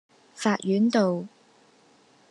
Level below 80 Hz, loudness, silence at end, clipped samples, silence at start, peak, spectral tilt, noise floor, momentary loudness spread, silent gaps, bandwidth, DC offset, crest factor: -82 dBFS; -25 LUFS; 1.05 s; under 0.1%; 0.35 s; -8 dBFS; -6 dB/octave; -59 dBFS; 11 LU; none; 11 kHz; under 0.1%; 18 dB